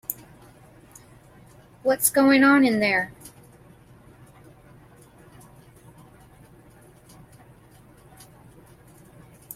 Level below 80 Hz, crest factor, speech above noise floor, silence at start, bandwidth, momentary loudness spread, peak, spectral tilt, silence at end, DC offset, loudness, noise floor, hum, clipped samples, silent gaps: -60 dBFS; 20 dB; 33 dB; 0.1 s; 16.5 kHz; 24 LU; -6 dBFS; -3.5 dB/octave; 6.45 s; under 0.1%; -20 LUFS; -52 dBFS; none; under 0.1%; none